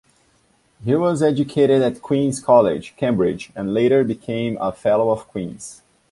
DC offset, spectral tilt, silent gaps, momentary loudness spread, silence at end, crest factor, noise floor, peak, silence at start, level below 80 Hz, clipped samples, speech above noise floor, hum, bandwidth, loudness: under 0.1%; -6.5 dB/octave; none; 14 LU; 0.4 s; 18 dB; -60 dBFS; -2 dBFS; 0.8 s; -54 dBFS; under 0.1%; 42 dB; none; 11.5 kHz; -19 LUFS